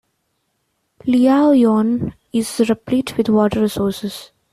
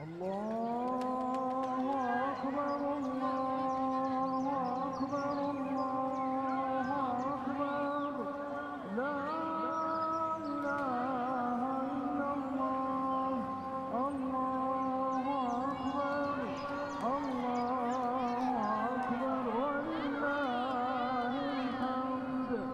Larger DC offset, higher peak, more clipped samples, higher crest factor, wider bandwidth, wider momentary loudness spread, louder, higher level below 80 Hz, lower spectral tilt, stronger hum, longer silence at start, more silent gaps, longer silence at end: neither; first, -4 dBFS vs -22 dBFS; neither; about the same, 14 dB vs 12 dB; first, 14.5 kHz vs 9.4 kHz; first, 13 LU vs 3 LU; first, -17 LUFS vs -35 LUFS; first, -50 dBFS vs -68 dBFS; about the same, -6 dB/octave vs -6.5 dB/octave; neither; first, 1.05 s vs 0 s; neither; first, 0.3 s vs 0 s